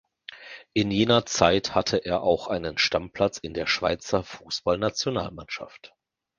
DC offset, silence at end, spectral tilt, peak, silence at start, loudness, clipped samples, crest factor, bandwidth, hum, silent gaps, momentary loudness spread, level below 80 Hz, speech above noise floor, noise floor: under 0.1%; 0.55 s; -4 dB/octave; -2 dBFS; 0.3 s; -25 LUFS; under 0.1%; 24 dB; 9.8 kHz; none; none; 15 LU; -50 dBFS; 20 dB; -45 dBFS